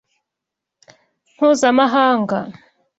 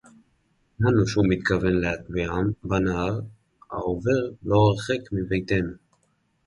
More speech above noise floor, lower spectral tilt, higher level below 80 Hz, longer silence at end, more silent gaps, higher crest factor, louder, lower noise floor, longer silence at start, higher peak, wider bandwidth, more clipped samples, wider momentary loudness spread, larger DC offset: first, 68 dB vs 45 dB; second, -4.5 dB/octave vs -7 dB/octave; second, -64 dBFS vs -42 dBFS; second, 0.45 s vs 0.7 s; neither; about the same, 16 dB vs 18 dB; first, -16 LUFS vs -24 LUFS; first, -83 dBFS vs -68 dBFS; first, 1.4 s vs 0.8 s; first, -2 dBFS vs -8 dBFS; second, 8.2 kHz vs 11.5 kHz; neither; about the same, 10 LU vs 9 LU; neither